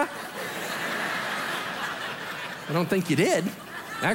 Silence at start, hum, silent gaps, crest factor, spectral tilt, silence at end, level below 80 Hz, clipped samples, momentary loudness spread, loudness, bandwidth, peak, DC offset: 0 s; none; none; 16 dB; -4.5 dB/octave; 0 s; -68 dBFS; under 0.1%; 10 LU; -28 LUFS; 17 kHz; -12 dBFS; under 0.1%